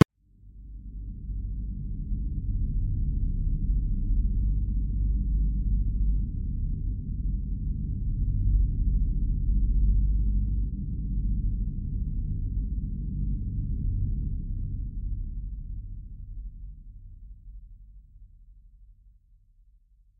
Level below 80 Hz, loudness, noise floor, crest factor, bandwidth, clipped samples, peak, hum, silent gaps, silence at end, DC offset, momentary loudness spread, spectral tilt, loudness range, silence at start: -28 dBFS; -31 LUFS; -59 dBFS; 26 dB; 3.1 kHz; under 0.1%; -2 dBFS; none; none; 1.1 s; under 0.1%; 16 LU; -9 dB/octave; 13 LU; 0 s